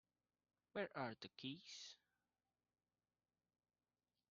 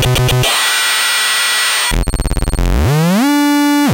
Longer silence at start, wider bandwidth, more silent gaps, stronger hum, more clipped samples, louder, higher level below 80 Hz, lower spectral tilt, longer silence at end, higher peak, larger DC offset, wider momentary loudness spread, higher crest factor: first, 0.75 s vs 0 s; second, 7.2 kHz vs 17.5 kHz; neither; first, 60 Hz at -90 dBFS vs none; neither; second, -52 LUFS vs -12 LUFS; second, under -90 dBFS vs -20 dBFS; about the same, -3 dB/octave vs -3.5 dB/octave; first, 2.35 s vs 0 s; second, -34 dBFS vs -2 dBFS; neither; first, 10 LU vs 7 LU; first, 24 dB vs 12 dB